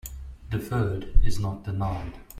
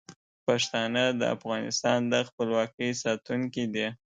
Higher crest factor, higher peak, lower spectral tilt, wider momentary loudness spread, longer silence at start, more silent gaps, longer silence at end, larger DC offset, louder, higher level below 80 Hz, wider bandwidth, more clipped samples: about the same, 18 dB vs 20 dB; first, -6 dBFS vs -10 dBFS; first, -7 dB/octave vs -4 dB/octave; first, 9 LU vs 5 LU; about the same, 0.05 s vs 0.1 s; second, none vs 0.16-0.47 s, 2.33-2.38 s, 2.74-2.78 s; second, 0 s vs 0.2 s; neither; about the same, -30 LUFS vs -28 LUFS; first, -30 dBFS vs -72 dBFS; first, 16 kHz vs 9.4 kHz; neither